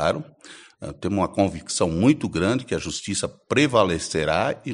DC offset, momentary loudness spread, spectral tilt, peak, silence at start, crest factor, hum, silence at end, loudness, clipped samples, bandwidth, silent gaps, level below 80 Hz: under 0.1%; 11 LU; -5 dB/octave; -4 dBFS; 0 s; 20 dB; none; 0 s; -23 LUFS; under 0.1%; 11 kHz; none; -48 dBFS